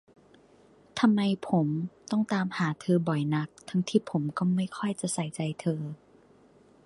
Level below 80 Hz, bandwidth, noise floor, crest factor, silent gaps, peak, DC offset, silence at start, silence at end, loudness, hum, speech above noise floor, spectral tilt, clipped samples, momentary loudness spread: -70 dBFS; 11.5 kHz; -59 dBFS; 20 dB; none; -10 dBFS; under 0.1%; 0.95 s; 0.9 s; -29 LUFS; none; 31 dB; -6 dB/octave; under 0.1%; 7 LU